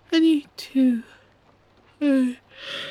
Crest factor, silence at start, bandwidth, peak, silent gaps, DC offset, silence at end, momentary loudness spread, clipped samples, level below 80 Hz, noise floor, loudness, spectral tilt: 14 dB; 0.1 s; 13 kHz; -10 dBFS; none; under 0.1%; 0 s; 13 LU; under 0.1%; -70 dBFS; -58 dBFS; -23 LUFS; -4.5 dB/octave